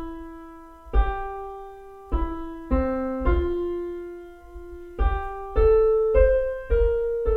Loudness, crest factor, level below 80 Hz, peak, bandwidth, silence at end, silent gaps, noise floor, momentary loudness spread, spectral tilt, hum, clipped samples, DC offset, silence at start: -24 LUFS; 18 dB; -28 dBFS; -4 dBFS; 4.3 kHz; 0 s; none; -43 dBFS; 23 LU; -9.5 dB/octave; none; under 0.1%; under 0.1%; 0 s